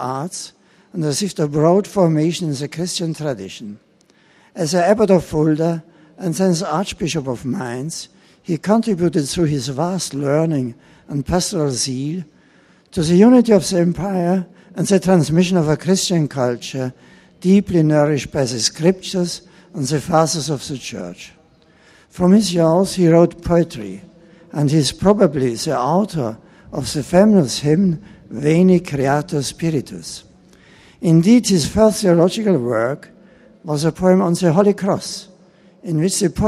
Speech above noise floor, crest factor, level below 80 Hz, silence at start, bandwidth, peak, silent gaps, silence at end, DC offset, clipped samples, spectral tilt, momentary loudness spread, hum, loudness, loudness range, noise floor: 37 dB; 18 dB; -46 dBFS; 0 s; 14.5 kHz; 0 dBFS; none; 0 s; under 0.1%; under 0.1%; -6 dB/octave; 15 LU; none; -17 LUFS; 4 LU; -54 dBFS